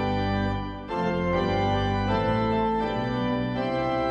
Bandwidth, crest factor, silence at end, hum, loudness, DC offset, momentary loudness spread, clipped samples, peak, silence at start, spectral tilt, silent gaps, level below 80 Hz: 8.4 kHz; 14 dB; 0 s; none; -26 LUFS; under 0.1%; 4 LU; under 0.1%; -12 dBFS; 0 s; -7.5 dB/octave; none; -40 dBFS